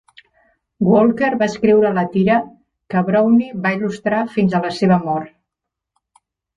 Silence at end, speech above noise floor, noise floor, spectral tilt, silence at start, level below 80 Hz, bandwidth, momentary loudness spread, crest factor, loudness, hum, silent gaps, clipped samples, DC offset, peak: 1.3 s; 66 dB; -82 dBFS; -7.5 dB/octave; 0.8 s; -56 dBFS; 7.6 kHz; 8 LU; 14 dB; -17 LUFS; none; none; under 0.1%; under 0.1%; -2 dBFS